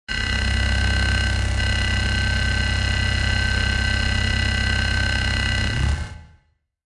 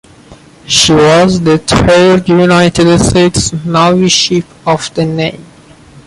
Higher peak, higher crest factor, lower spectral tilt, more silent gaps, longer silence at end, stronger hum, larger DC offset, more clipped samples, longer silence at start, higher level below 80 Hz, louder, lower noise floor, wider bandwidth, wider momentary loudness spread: second, -6 dBFS vs 0 dBFS; about the same, 14 dB vs 10 dB; about the same, -4 dB/octave vs -4.5 dB/octave; neither; about the same, 0.6 s vs 0.65 s; neither; neither; neither; second, 0.1 s vs 0.3 s; first, -24 dBFS vs -32 dBFS; second, -21 LUFS vs -8 LUFS; first, -62 dBFS vs -37 dBFS; about the same, 11.5 kHz vs 11.5 kHz; second, 2 LU vs 8 LU